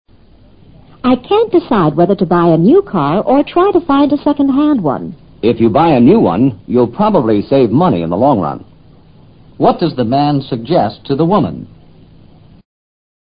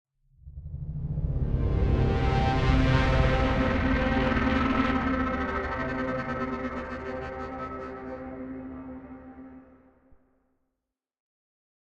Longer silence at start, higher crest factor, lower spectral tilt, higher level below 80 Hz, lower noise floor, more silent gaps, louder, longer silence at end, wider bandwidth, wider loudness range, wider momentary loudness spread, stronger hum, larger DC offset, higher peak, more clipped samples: first, 1.05 s vs 0.45 s; second, 12 dB vs 18 dB; first, -12 dB/octave vs -7.5 dB/octave; second, -42 dBFS vs -34 dBFS; second, -43 dBFS vs -86 dBFS; neither; first, -12 LUFS vs -28 LUFS; second, 1.65 s vs 2.25 s; second, 5.2 kHz vs 8 kHz; second, 4 LU vs 18 LU; second, 8 LU vs 18 LU; neither; neither; first, 0 dBFS vs -10 dBFS; neither